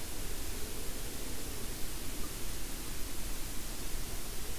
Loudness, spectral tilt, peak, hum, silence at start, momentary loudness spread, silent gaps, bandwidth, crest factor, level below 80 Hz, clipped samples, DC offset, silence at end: -41 LUFS; -3 dB/octave; -22 dBFS; none; 0 s; 0 LU; none; 16 kHz; 12 dB; -44 dBFS; under 0.1%; 1%; 0 s